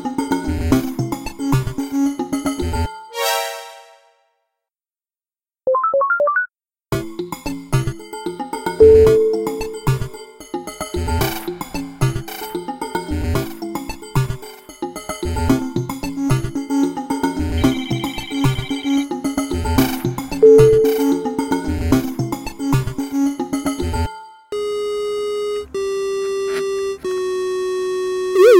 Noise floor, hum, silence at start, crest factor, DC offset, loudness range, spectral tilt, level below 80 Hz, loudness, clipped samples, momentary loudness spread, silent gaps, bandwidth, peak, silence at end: under -90 dBFS; none; 0 s; 18 dB; under 0.1%; 8 LU; -6 dB/octave; -34 dBFS; -19 LUFS; under 0.1%; 12 LU; none; 17 kHz; 0 dBFS; 0 s